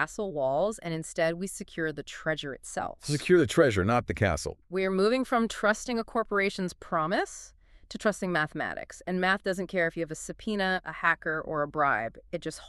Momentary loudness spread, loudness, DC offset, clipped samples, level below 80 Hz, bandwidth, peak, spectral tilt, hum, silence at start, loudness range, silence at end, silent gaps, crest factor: 11 LU; -29 LUFS; under 0.1%; under 0.1%; -52 dBFS; 13 kHz; -8 dBFS; -5 dB/octave; none; 0 s; 4 LU; 0 s; none; 20 dB